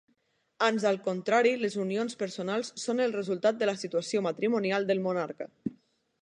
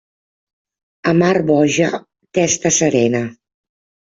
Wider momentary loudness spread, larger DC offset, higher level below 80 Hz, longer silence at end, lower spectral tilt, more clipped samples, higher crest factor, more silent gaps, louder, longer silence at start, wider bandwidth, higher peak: about the same, 8 LU vs 9 LU; neither; second, -78 dBFS vs -56 dBFS; second, 0.5 s vs 0.8 s; about the same, -5 dB/octave vs -4.5 dB/octave; neither; about the same, 18 dB vs 16 dB; neither; second, -29 LUFS vs -16 LUFS; second, 0.6 s vs 1.05 s; first, 11 kHz vs 8 kHz; second, -12 dBFS vs -2 dBFS